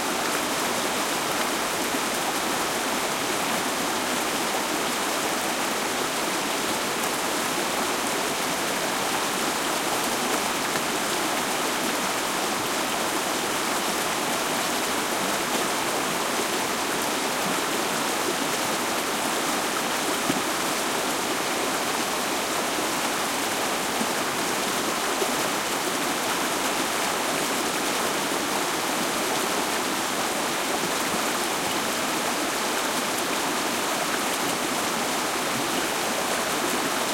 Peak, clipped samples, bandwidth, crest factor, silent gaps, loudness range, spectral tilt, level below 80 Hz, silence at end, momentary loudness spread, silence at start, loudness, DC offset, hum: -10 dBFS; under 0.1%; 16.5 kHz; 16 dB; none; 0 LU; -1.5 dB/octave; -60 dBFS; 0 s; 1 LU; 0 s; -24 LUFS; under 0.1%; none